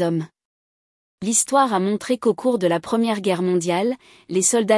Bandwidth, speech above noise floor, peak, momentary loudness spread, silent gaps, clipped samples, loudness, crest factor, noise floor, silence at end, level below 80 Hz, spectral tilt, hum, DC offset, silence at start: 12 kHz; over 70 dB; -4 dBFS; 9 LU; 0.45-1.18 s; under 0.1%; -20 LUFS; 16 dB; under -90 dBFS; 0 s; -68 dBFS; -4 dB/octave; none; under 0.1%; 0 s